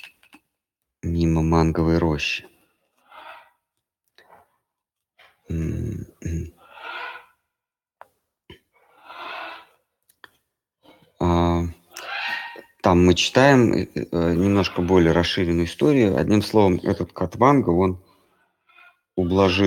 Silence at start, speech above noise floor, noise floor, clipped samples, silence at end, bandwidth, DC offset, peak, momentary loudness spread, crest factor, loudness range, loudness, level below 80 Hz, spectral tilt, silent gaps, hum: 0.05 s; 68 dB; -87 dBFS; under 0.1%; 0 s; 16.5 kHz; under 0.1%; -2 dBFS; 18 LU; 22 dB; 20 LU; -20 LUFS; -40 dBFS; -6 dB/octave; none; none